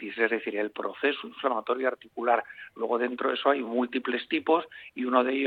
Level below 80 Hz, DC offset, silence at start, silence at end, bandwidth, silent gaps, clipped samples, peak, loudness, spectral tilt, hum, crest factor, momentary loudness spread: -78 dBFS; under 0.1%; 0 s; 0 s; 4.8 kHz; none; under 0.1%; -8 dBFS; -28 LUFS; -6 dB/octave; none; 20 dB; 6 LU